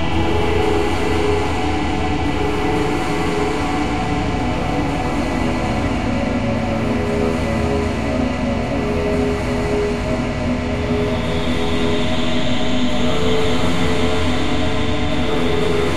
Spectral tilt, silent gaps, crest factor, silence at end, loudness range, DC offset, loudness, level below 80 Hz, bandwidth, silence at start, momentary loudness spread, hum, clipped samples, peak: -6 dB/octave; none; 14 dB; 0 s; 1 LU; 5%; -19 LUFS; -28 dBFS; 13.5 kHz; 0 s; 2 LU; none; under 0.1%; -4 dBFS